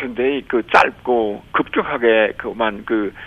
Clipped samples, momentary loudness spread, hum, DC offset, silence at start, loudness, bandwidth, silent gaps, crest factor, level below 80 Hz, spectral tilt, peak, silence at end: under 0.1%; 7 LU; none; under 0.1%; 0 s; -18 LUFS; 11 kHz; none; 18 dB; -50 dBFS; -5.5 dB/octave; 0 dBFS; 0 s